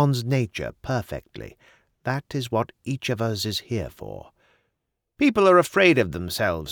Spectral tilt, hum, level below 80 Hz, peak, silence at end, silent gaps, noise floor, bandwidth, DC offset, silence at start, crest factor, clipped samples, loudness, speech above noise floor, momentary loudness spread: -5.5 dB/octave; none; -50 dBFS; -4 dBFS; 0 s; none; -78 dBFS; over 20 kHz; under 0.1%; 0 s; 20 dB; under 0.1%; -23 LUFS; 55 dB; 20 LU